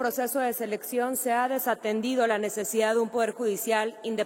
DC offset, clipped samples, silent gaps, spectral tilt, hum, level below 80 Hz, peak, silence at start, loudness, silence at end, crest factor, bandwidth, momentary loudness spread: under 0.1%; under 0.1%; none; -3 dB/octave; none; -78 dBFS; -10 dBFS; 0 s; -27 LUFS; 0 s; 16 dB; 16.5 kHz; 4 LU